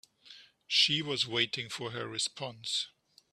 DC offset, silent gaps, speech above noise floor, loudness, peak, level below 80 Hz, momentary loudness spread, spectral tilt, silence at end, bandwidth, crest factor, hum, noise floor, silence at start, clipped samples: under 0.1%; none; 24 dB; -31 LUFS; -12 dBFS; -76 dBFS; 12 LU; -2 dB/octave; 0.45 s; 14 kHz; 24 dB; none; -57 dBFS; 0.25 s; under 0.1%